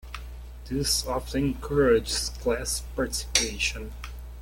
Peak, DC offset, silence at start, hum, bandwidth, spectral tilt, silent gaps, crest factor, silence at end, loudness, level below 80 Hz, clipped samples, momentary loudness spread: -2 dBFS; under 0.1%; 0.05 s; none; 17 kHz; -3 dB/octave; none; 26 dB; 0 s; -26 LUFS; -38 dBFS; under 0.1%; 18 LU